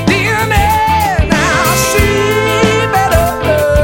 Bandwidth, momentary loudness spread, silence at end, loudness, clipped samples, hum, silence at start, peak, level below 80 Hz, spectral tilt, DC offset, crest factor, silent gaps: 17 kHz; 2 LU; 0 s; -11 LUFS; under 0.1%; none; 0 s; 0 dBFS; -22 dBFS; -4.5 dB/octave; under 0.1%; 10 dB; none